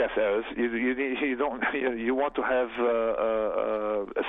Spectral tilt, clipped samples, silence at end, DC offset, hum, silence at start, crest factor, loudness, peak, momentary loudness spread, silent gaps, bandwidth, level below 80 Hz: -8 dB/octave; under 0.1%; 0 s; under 0.1%; none; 0 s; 12 dB; -27 LUFS; -14 dBFS; 2 LU; none; 4 kHz; -54 dBFS